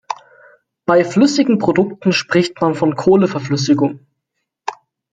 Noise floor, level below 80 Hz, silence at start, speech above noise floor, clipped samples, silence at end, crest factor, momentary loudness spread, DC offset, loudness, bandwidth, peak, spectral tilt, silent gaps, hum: -75 dBFS; -56 dBFS; 0.1 s; 61 dB; under 0.1%; 0.4 s; 16 dB; 16 LU; under 0.1%; -15 LUFS; 9.2 kHz; 0 dBFS; -6 dB/octave; none; none